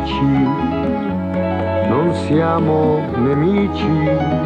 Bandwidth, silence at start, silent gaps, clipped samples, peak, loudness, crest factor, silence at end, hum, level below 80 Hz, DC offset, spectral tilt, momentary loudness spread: 9.2 kHz; 0 s; none; under 0.1%; -4 dBFS; -17 LUFS; 12 dB; 0 s; none; -36 dBFS; under 0.1%; -8.5 dB/octave; 4 LU